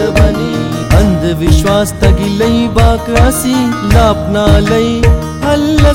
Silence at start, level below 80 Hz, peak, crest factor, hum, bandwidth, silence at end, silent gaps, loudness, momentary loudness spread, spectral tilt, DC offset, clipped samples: 0 s; -16 dBFS; 0 dBFS; 10 dB; none; 17 kHz; 0 s; none; -10 LUFS; 3 LU; -6 dB/octave; 0.2%; 0.2%